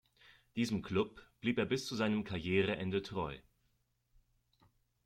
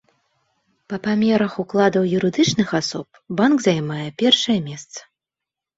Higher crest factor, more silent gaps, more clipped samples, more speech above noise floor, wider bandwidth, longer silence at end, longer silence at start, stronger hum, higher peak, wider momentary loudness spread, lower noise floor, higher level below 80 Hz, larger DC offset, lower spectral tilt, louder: about the same, 18 dB vs 18 dB; neither; neither; second, 42 dB vs 67 dB; first, 14 kHz vs 8 kHz; first, 1.65 s vs 0.75 s; second, 0.55 s vs 0.9 s; neither; second, -20 dBFS vs -2 dBFS; second, 8 LU vs 15 LU; second, -78 dBFS vs -87 dBFS; second, -66 dBFS vs -60 dBFS; neither; about the same, -5.5 dB/octave vs -5 dB/octave; second, -37 LUFS vs -19 LUFS